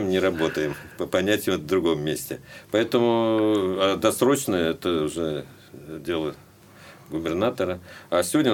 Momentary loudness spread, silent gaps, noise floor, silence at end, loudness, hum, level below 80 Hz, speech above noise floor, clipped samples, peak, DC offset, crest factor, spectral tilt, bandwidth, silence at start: 13 LU; none; -48 dBFS; 0 s; -24 LUFS; none; -56 dBFS; 25 dB; under 0.1%; -6 dBFS; under 0.1%; 18 dB; -4.5 dB/octave; 18 kHz; 0 s